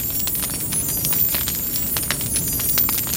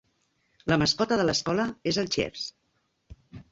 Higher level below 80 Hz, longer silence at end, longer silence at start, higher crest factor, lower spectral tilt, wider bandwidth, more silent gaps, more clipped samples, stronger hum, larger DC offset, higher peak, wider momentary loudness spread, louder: first, -38 dBFS vs -54 dBFS; about the same, 0 s vs 0.1 s; second, 0 s vs 0.65 s; about the same, 20 dB vs 22 dB; second, -2 dB/octave vs -4 dB/octave; first, over 20 kHz vs 8 kHz; neither; neither; neither; neither; first, -2 dBFS vs -8 dBFS; second, 4 LU vs 12 LU; first, -19 LUFS vs -27 LUFS